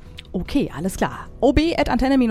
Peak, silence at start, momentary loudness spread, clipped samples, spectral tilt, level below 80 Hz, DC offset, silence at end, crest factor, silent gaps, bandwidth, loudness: 0 dBFS; 0.05 s; 8 LU; under 0.1%; -6 dB/octave; -32 dBFS; under 0.1%; 0 s; 20 dB; none; 15 kHz; -21 LUFS